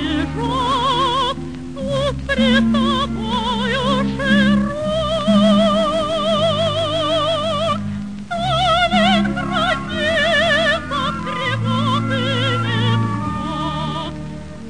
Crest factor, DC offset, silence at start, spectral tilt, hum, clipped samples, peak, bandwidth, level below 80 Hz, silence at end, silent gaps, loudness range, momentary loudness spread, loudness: 14 dB; 1%; 0 s; -5.5 dB/octave; none; under 0.1%; -4 dBFS; 10 kHz; -36 dBFS; 0 s; none; 2 LU; 9 LU; -18 LUFS